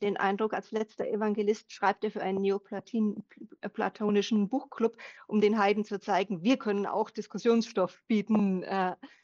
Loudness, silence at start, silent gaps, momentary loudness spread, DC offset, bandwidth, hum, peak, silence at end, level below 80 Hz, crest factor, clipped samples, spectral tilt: -30 LUFS; 0 s; none; 7 LU; under 0.1%; 7.2 kHz; none; -12 dBFS; 0.15 s; -78 dBFS; 18 dB; under 0.1%; -6.5 dB/octave